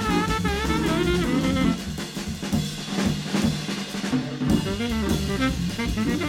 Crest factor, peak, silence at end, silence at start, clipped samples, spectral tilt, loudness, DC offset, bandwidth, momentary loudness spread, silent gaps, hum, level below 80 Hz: 16 dB; -8 dBFS; 0 s; 0 s; under 0.1%; -5 dB/octave; -25 LUFS; under 0.1%; 16.5 kHz; 6 LU; none; none; -36 dBFS